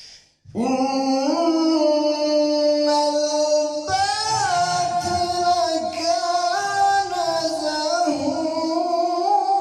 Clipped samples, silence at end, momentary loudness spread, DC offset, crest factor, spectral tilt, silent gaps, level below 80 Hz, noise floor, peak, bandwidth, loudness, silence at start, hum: under 0.1%; 0 s; 4 LU; under 0.1%; 12 dB; -3 dB/octave; none; -60 dBFS; -46 dBFS; -8 dBFS; 13 kHz; -20 LUFS; 0 s; none